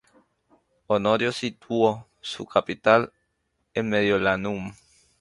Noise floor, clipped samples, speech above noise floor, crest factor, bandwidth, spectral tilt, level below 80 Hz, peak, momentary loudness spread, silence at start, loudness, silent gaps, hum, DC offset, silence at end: -74 dBFS; under 0.1%; 51 dB; 22 dB; 11.5 kHz; -5.5 dB/octave; -58 dBFS; -4 dBFS; 14 LU; 0.9 s; -24 LUFS; none; none; under 0.1%; 0.5 s